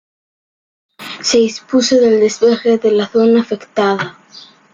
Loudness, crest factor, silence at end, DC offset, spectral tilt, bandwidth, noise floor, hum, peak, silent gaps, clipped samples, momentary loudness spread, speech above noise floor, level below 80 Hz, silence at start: -13 LUFS; 12 dB; 0.35 s; under 0.1%; -4 dB/octave; 9.2 kHz; -41 dBFS; none; -2 dBFS; none; under 0.1%; 10 LU; 28 dB; -60 dBFS; 1 s